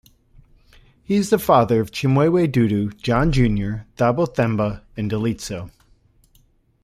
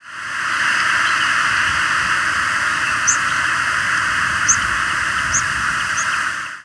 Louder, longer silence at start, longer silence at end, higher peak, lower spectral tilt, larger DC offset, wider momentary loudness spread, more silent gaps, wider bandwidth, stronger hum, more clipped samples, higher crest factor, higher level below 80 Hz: second, -20 LUFS vs -16 LUFS; first, 1.1 s vs 0.05 s; first, 1.15 s vs 0 s; about the same, -2 dBFS vs -2 dBFS; first, -7 dB/octave vs 0 dB/octave; neither; first, 12 LU vs 3 LU; neither; first, 15.5 kHz vs 11 kHz; neither; neither; about the same, 18 dB vs 16 dB; first, -38 dBFS vs -44 dBFS